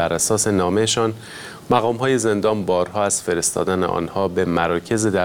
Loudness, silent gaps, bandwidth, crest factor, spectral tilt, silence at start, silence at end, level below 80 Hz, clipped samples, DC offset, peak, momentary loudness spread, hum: -19 LUFS; none; 18 kHz; 18 dB; -4 dB/octave; 0 s; 0 s; -50 dBFS; under 0.1%; 0.1%; -2 dBFS; 4 LU; none